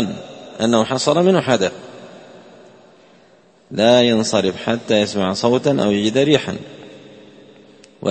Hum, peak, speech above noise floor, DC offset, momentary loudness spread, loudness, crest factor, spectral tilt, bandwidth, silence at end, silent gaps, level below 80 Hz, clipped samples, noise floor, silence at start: none; 0 dBFS; 35 dB; under 0.1%; 20 LU; -17 LUFS; 18 dB; -5 dB/octave; 8.8 kHz; 0 s; none; -58 dBFS; under 0.1%; -51 dBFS; 0 s